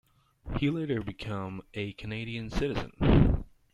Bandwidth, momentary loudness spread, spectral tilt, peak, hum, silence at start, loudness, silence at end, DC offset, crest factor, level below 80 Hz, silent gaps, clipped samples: 11.5 kHz; 13 LU; -8 dB/octave; -8 dBFS; none; 0.45 s; -31 LUFS; 0.3 s; under 0.1%; 22 dB; -36 dBFS; none; under 0.1%